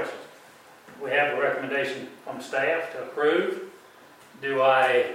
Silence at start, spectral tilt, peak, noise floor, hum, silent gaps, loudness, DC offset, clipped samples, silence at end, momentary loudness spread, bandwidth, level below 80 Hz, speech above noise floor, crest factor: 0 s; -4.5 dB/octave; -8 dBFS; -51 dBFS; none; none; -25 LUFS; under 0.1%; under 0.1%; 0 s; 17 LU; 16 kHz; -80 dBFS; 26 dB; 18 dB